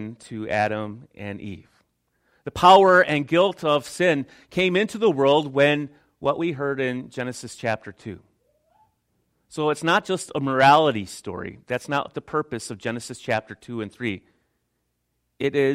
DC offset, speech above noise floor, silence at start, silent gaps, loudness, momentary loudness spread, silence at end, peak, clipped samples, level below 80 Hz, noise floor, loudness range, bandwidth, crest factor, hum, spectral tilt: under 0.1%; 52 dB; 0 s; none; -22 LUFS; 19 LU; 0 s; -2 dBFS; under 0.1%; -60 dBFS; -74 dBFS; 11 LU; 15 kHz; 22 dB; none; -5 dB/octave